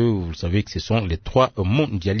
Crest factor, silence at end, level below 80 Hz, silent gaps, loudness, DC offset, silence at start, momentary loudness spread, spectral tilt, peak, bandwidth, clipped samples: 16 dB; 0 s; -38 dBFS; none; -22 LUFS; under 0.1%; 0 s; 4 LU; -7 dB/octave; -4 dBFS; 6.6 kHz; under 0.1%